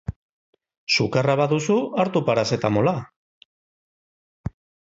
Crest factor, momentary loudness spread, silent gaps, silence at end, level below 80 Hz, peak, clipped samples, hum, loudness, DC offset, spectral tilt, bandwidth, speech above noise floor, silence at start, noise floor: 18 dB; 16 LU; 0.16-0.53 s, 0.77-0.87 s, 3.16-4.44 s; 0.4 s; -50 dBFS; -6 dBFS; under 0.1%; none; -21 LUFS; under 0.1%; -5.5 dB/octave; 8 kHz; over 69 dB; 0.1 s; under -90 dBFS